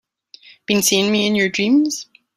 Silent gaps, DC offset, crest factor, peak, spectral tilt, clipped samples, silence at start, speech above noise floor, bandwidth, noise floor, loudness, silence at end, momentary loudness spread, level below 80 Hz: none; under 0.1%; 16 dB; -2 dBFS; -3 dB/octave; under 0.1%; 0.7 s; 30 dB; 16 kHz; -47 dBFS; -16 LUFS; 0.35 s; 10 LU; -60 dBFS